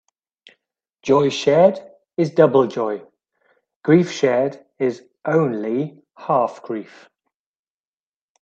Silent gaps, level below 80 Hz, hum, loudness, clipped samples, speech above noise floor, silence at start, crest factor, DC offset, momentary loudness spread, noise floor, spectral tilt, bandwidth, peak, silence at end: 3.76-3.81 s; -64 dBFS; none; -19 LUFS; under 0.1%; over 72 dB; 1.05 s; 20 dB; under 0.1%; 16 LU; under -90 dBFS; -6.5 dB/octave; 8 kHz; 0 dBFS; 1.6 s